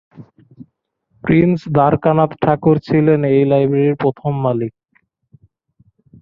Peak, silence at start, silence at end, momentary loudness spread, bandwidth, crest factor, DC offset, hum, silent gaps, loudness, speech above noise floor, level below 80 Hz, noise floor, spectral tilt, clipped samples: -2 dBFS; 0.2 s; 1.5 s; 6 LU; 5.6 kHz; 16 dB; under 0.1%; none; none; -15 LUFS; 52 dB; -50 dBFS; -66 dBFS; -10.5 dB/octave; under 0.1%